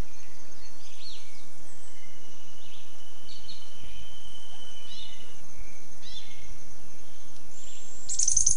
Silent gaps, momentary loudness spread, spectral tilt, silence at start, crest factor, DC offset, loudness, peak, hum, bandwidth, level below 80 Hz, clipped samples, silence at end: none; 8 LU; -1 dB/octave; 0 s; 30 dB; 10%; -34 LUFS; -6 dBFS; none; 11.5 kHz; -54 dBFS; under 0.1%; 0 s